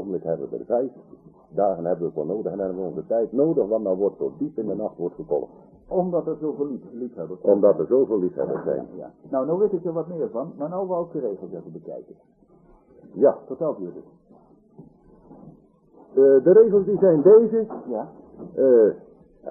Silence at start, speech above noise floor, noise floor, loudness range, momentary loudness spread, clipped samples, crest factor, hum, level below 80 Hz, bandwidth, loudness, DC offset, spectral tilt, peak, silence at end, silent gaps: 0 s; 32 dB; -54 dBFS; 10 LU; 19 LU; under 0.1%; 18 dB; none; -62 dBFS; 1.9 kHz; -22 LUFS; under 0.1%; -14 dB/octave; -4 dBFS; 0 s; none